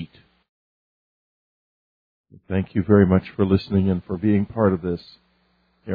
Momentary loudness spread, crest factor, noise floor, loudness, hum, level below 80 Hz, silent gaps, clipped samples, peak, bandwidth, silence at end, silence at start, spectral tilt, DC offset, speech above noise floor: 11 LU; 20 dB; -65 dBFS; -21 LUFS; none; -50 dBFS; 0.49-2.24 s; under 0.1%; -2 dBFS; 5 kHz; 0 s; 0 s; -11 dB/octave; under 0.1%; 45 dB